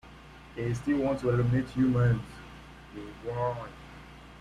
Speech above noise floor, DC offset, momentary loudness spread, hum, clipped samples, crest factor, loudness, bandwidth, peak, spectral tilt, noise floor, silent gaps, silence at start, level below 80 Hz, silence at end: 22 dB; under 0.1%; 22 LU; none; under 0.1%; 14 dB; -29 LUFS; 10.5 kHz; -16 dBFS; -8.5 dB/octave; -50 dBFS; none; 0.05 s; -50 dBFS; 0 s